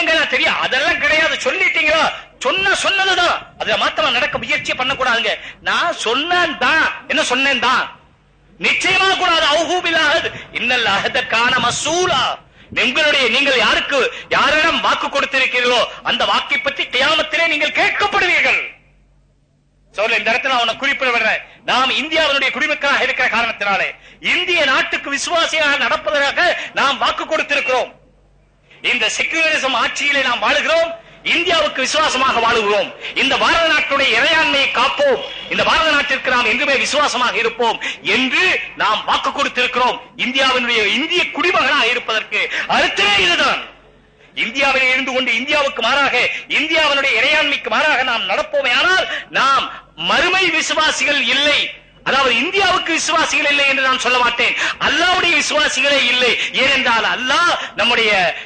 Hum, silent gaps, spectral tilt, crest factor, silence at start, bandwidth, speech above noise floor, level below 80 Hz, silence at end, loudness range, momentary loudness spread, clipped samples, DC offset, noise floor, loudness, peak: none; none; -1.5 dB/octave; 12 dB; 0 s; 9.4 kHz; 41 dB; -48 dBFS; 0 s; 3 LU; 6 LU; under 0.1%; under 0.1%; -57 dBFS; -14 LUFS; -4 dBFS